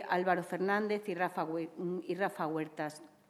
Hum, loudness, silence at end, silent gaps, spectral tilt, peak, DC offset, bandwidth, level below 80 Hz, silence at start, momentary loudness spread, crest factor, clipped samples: none; -35 LUFS; 0.2 s; none; -6 dB/octave; -16 dBFS; under 0.1%; 14 kHz; -86 dBFS; 0 s; 8 LU; 20 dB; under 0.1%